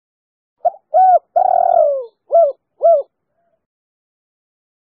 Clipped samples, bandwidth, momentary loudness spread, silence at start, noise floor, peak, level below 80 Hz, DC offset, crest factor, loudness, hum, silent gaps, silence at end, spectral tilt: under 0.1%; 1.6 kHz; 10 LU; 0.65 s; -67 dBFS; -4 dBFS; -72 dBFS; under 0.1%; 14 dB; -15 LUFS; none; none; 2 s; -3 dB/octave